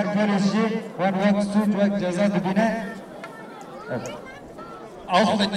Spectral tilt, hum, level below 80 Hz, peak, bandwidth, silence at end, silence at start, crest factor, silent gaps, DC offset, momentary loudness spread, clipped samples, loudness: -6 dB/octave; none; -58 dBFS; -6 dBFS; 11.5 kHz; 0 s; 0 s; 18 dB; none; under 0.1%; 18 LU; under 0.1%; -22 LUFS